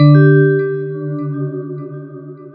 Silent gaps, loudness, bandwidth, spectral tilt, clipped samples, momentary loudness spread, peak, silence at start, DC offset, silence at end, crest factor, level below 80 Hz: none; -14 LUFS; 4.2 kHz; -13 dB/octave; under 0.1%; 22 LU; 0 dBFS; 0 s; under 0.1%; 0.05 s; 14 dB; -64 dBFS